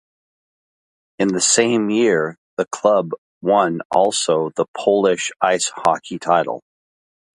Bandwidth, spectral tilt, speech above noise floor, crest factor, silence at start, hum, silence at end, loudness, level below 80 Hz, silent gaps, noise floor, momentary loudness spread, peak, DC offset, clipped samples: 11.5 kHz; -3 dB/octave; over 72 dB; 18 dB; 1.2 s; none; 0.8 s; -18 LUFS; -64 dBFS; 2.38-2.57 s, 3.18-3.41 s, 3.85-3.90 s, 4.68-4.74 s; under -90 dBFS; 10 LU; 0 dBFS; under 0.1%; under 0.1%